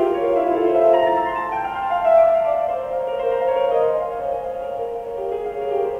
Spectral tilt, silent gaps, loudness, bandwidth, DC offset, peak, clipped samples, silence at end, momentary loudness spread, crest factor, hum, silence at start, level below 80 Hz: -6.5 dB/octave; none; -20 LUFS; 5.8 kHz; under 0.1%; -4 dBFS; under 0.1%; 0 s; 11 LU; 14 dB; none; 0 s; -52 dBFS